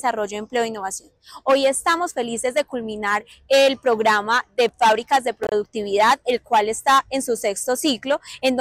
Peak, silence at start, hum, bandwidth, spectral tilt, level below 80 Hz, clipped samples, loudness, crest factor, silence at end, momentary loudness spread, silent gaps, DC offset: -10 dBFS; 0.05 s; none; 16 kHz; -2 dB/octave; -58 dBFS; under 0.1%; -20 LUFS; 12 dB; 0 s; 8 LU; none; under 0.1%